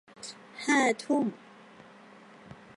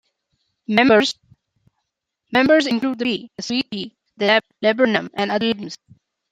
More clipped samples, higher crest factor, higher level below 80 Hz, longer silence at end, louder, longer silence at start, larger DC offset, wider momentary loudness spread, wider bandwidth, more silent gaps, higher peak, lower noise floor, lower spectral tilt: neither; about the same, 20 dB vs 20 dB; second, -76 dBFS vs -62 dBFS; second, 0.25 s vs 0.55 s; second, -28 LUFS vs -19 LUFS; second, 0.2 s vs 0.7 s; neither; first, 25 LU vs 17 LU; first, 11.5 kHz vs 9.2 kHz; neither; second, -12 dBFS vs 0 dBFS; second, -53 dBFS vs -78 dBFS; about the same, -3.5 dB/octave vs -4.5 dB/octave